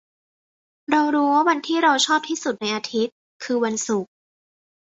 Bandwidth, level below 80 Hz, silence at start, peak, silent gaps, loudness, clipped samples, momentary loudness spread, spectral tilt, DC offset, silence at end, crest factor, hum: 8.2 kHz; -70 dBFS; 0.9 s; -4 dBFS; 3.12-3.40 s; -21 LUFS; under 0.1%; 10 LU; -2.5 dB/octave; under 0.1%; 0.9 s; 20 dB; none